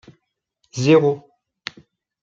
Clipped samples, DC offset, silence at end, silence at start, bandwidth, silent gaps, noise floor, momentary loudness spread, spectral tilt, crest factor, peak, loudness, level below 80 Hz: under 0.1%; under 0.1%; 1.05 s; 0.75 s; 7.6 kHz; none; -71 dBFS; 20 LU; -6.5 dB/octave; 20 dB; -2 dBFS; -18 LUFS; -62 dBFS